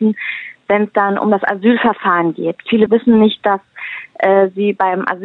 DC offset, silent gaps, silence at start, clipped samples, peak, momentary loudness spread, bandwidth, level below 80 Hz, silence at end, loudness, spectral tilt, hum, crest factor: under 0.1%; none; 0 s; under 0.1%; 0 dBFS; 10 LU; 4.1 kHz; -58 dBFS; 0 s; -14 LUFS; -9 dB/octave; none; 14 dB